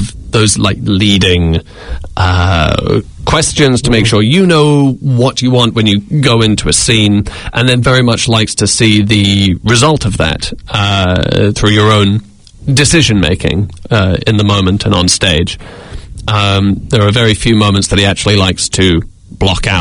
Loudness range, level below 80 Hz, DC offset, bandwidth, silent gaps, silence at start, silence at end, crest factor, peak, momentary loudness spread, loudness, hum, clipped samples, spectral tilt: 2 LU; -28 dBFS; under 0.1%; 11 kHz; none; 0 s; 0 s; 10 dB; 0 dBFS; 7 LU; -10 LUFS; none; 0.4%; -4.5 dB/octave